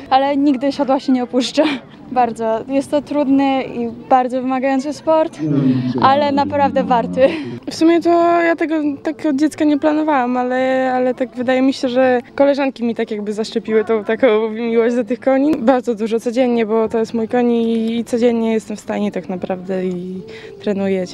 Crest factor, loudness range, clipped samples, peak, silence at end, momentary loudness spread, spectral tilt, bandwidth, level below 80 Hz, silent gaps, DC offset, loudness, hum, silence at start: 16 dB; 2 LU; under 0.1%; 0 dBFS; 0 s; 8 LU; -6 dB/octave; 11.5 kHz; -56 dBFS; none; under 0.1%; -17 LUFS; none; 0 s